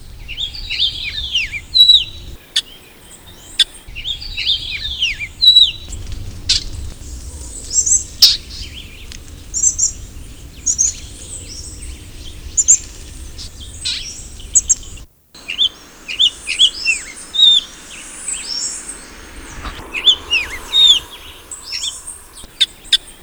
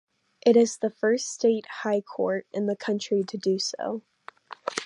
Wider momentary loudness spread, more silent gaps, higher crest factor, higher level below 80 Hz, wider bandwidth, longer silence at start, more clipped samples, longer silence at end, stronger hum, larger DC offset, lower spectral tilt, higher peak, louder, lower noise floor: first, 24 LU vs 12 LU; neither; about the same, 18 dB vs 20 dB; first, -36 dBFS vs -78 dBFS; first, over 20 kHz vs 11 kHz; second, 0 s vs 0.45 s; neither; about the same, 0.1 s vs 0 s; neither; neither; second, 1 dB/octave vs -4 dB/octave; first, 0 dBFS vs -6 dBFS; first, -13 LUFS vs -26 LUFS; second, -40 dBFS vs -46 dBFS